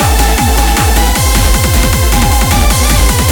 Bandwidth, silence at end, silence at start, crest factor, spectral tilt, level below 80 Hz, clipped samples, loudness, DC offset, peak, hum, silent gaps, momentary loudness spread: over 20 kHz; 0 s; 0 s; 8 dB; -3.5 dB/octave; -12 dBFS; under 0.1%; -10 LUFS; under 0.1%; 0 dBFS; none; none; 1 LU